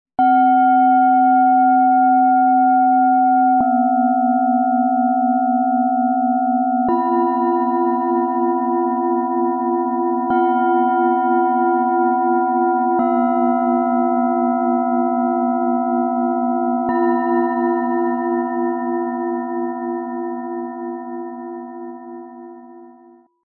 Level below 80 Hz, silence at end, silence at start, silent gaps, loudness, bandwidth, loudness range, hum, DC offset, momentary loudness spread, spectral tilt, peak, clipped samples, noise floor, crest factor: -66 dBFS; 0.55 s; 0.2 s; none; -17 LUFS; 3.3 kHz; 10 LU; none; under 0.1%; 12 LU; -11 dB/octave; -6 dBFS; under 0.1%; -48 dBFS; 10 dB